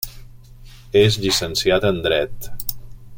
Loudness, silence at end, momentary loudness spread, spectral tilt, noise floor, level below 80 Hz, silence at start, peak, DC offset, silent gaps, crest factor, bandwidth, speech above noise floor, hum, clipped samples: -19 LUFS; 0 s; 12 LU; -4 dB/octave; -41 dBFS; -38 dBFS; 0 s; -2 dBFS; under 0.1%; none; 18 dB; 17 kHz; 23 dB; none; under 0.1%